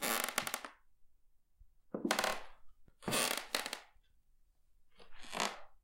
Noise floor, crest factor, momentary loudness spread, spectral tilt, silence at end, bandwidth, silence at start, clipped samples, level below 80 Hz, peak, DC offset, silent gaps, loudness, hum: -68 dBFS; 32 dB; 14 LU; -1.5 dB/octave; 0.05 s; 17 kHz; 0 s; under 0.1%; -64 dBFS; -10 dBFS; under 0.1%; none; -38 LUFS; none